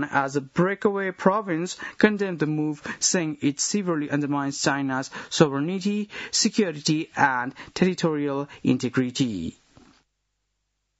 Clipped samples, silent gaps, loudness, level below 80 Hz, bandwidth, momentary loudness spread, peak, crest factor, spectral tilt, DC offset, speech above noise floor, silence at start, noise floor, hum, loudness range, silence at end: under 0.1%; none; -24 LUFS; -64 dBFS; 8.2 kHz; 7 LU; -2 dBFS; 22 dB; -4 dB/octave; under 0.1%; 52 dB; 0 s; -77 dBFS; none; 2 LU; 1.5 s